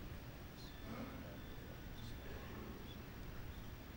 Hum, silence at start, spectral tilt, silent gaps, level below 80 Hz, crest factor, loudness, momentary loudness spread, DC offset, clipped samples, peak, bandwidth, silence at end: none; 0 s; -5.5 dB/octave; none; -56 dBFS; 14 dB; -52 LUFS; 3 LU; under 0.1%; under 0.1%; -36 dBFS; 16 kHz; 0 s